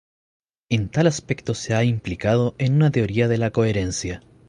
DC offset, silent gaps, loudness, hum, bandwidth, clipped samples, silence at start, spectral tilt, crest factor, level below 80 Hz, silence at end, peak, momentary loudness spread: under 0.1%; none; -21 LUFS; none; 11 kHz; under 0.1%; 0.7 s; -6 dB/octave; 18 dB; -44 dBFS; 0.3 s; -4 dBFS; 7 LU